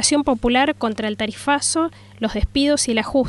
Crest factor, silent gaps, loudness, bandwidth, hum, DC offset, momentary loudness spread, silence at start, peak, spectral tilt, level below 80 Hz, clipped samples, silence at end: 16 dB; none; -20 LUFS; 11.5 kHz; none; under 0.1%; 7 LU; 0 s; -2 dBFS; -3 dB/octave; -36 dBFS; under 0.1%; 0 s